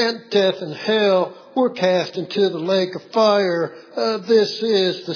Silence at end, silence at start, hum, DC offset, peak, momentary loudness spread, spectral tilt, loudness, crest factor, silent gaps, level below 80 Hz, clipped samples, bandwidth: 0 s; 0 s; none; under 0.1%; -4 dBFS; 7 LU; -5 dB/octave; -19 LUFS; 14 dB; none; -86 dBFS; under 0.1%; 5.4 kHz